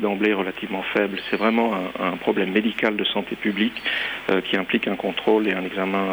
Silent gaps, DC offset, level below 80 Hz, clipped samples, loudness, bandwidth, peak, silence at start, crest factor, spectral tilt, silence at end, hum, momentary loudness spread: none; under 0.1%; -58 dBFS; under 0.1%; -23 LUFS; over 20 kHz; -6 dBFS; 0 s; 16 dB; -6.5 dB/octave; 0 s; none; 4 LU